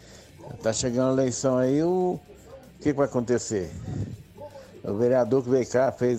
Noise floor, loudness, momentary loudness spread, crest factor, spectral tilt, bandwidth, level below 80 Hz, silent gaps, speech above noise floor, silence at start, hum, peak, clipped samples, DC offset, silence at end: -47 dBFS; -25 LUFS; 18 LU; 16 dB; -6 dB/octave; 14 kHz; -54 dBFS; none; 23 dB; 0.1 s; none; -10 dBFS; under 0.1%; under 0.1%; 0 s